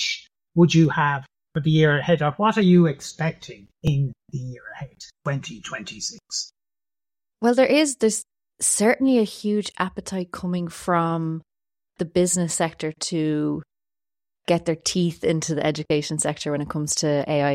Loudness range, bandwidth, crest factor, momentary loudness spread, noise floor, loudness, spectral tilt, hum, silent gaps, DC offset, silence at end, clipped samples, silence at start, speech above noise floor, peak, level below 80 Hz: 9 LU; 14.5 kHz; 18 dB; 15 LU; under -90 dBFS; -22 LUFS; -5 dB/octave; none; none; under 0.1%; 0 s; under 0.1%; 0 s; over 68 dB; -4 dBFS; -54 dBFS